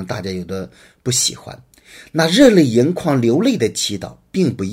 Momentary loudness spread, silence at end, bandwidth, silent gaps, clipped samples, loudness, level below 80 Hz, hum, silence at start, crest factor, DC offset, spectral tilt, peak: 18 LU; 0 s; 16 kHz; none; under 0.1%; -16 LUFS; -50 dBFS; none; 0 s; 16 dB; under 0.1%; -4.5 dB/octave; 0 dBFS